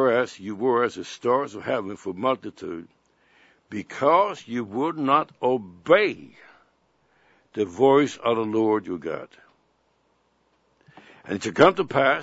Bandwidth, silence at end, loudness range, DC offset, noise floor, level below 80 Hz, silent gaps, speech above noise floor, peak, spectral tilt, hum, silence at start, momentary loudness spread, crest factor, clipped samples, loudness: 8 kHz; 0 s; 5 LU; under 0.1%; -67 dBFS; -68 dBFS; none; 44 dB; 0 dBFS; -5.5 dB/octave; none; 0 s; 16 LU; 24 dB; under 0.1%; -23 LUFS